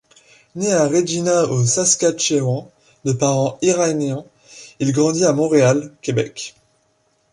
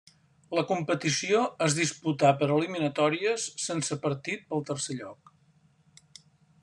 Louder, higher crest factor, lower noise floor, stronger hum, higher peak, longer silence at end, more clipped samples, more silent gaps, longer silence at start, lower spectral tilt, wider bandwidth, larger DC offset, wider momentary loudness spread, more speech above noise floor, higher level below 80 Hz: first, -18 LUFS vs -28 LUFS; second, 16 dB vs 22 dB; about the same, -63 dBFS vs -64 dBFS; neither; first, -2 dBFS vs -8 dBFS; second, 0.85 s vs 1.5 s; neither; neither; about the same, 0.55 s vs 0.5 s; about the same, -4.5 dB/octave vs -4 dB/octave; about the same, 11.5 kHz vs 12 kHz; neither; first, 12 LU vs 8 LU; first, 45 dB vs 36 dB; first, -60 dBFS vs -72 dBFS